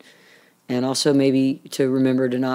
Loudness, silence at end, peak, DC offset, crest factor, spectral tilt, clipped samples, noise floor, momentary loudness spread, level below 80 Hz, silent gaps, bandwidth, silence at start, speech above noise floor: -20 LUFS; 0 s; -6 dBFS; under 0.1%; 14 dB; -5.5 dB/octave; under 0.1%; -53 dBFS; 6 LU; -76 dBFS; none; 15.5 kHz; 0.7 s; 34 dB